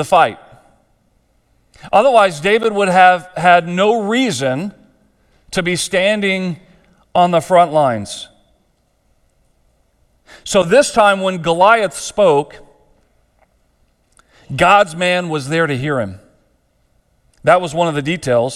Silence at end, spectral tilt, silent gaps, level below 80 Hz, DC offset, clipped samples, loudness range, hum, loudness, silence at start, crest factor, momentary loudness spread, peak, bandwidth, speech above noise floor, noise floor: 0 s; -4.5 dB/octave; none; -50 dBFS; under 0.1%; under 0.1%; 5 LU; none; -14 LUFS; 0 s; 16 dB; 12 LU; 0 dBFS; 14 kHz; 47 dB; -60 dBFS